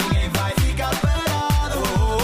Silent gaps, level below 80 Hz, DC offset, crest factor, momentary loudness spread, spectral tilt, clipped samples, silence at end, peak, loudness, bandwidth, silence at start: none; -24 dBFS; under 0.1%; 12 dB; 1 LU; -5 dB/octave; under 0.1%; 0 s; -8 dBFS; -21 LUFS; 16 kHz; 0 s